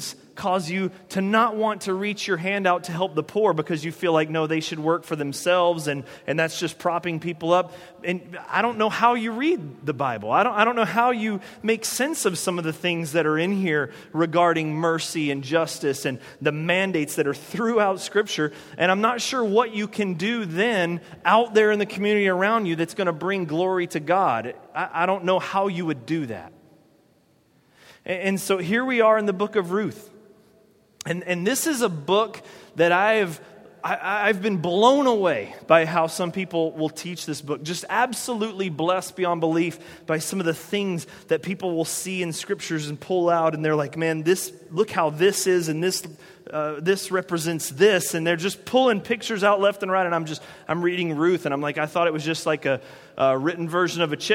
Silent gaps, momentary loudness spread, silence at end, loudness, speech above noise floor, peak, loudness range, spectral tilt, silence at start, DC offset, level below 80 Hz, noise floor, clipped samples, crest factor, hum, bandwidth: none; 9 LU; 0 s; -23 LUFS; 38 dB; -2 dBFS; 4 LU; -4.5 dB/octave; 0 s; under 0.1%; -70 dBFS; -61 dBFS; under 0.1%; 22 dB; none; 16.5 kHz